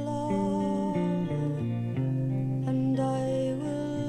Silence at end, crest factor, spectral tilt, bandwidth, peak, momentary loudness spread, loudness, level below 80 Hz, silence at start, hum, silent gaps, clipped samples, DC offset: 0 s; 12 dB; -8.5 dB/octave; 10 kHz; -16 dBFS; 3 LU; -29 LUFS; -56 dBFS; 0 s; none; none; under 0.1%; under 0.1%